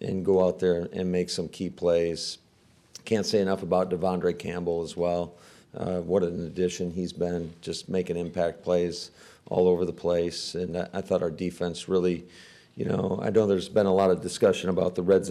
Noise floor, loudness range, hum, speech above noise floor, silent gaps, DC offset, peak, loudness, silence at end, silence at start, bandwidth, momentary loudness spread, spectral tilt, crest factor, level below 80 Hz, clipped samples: -60 dBFS; 4 LU; none; 34 dB; none; under 0.1%; -12 dBFS; -27 LUFS; 0 s; 0 s; 13 kHz; 10 LU; -6 dB/octave; 16 dB; -58 dBFS; under 0.1%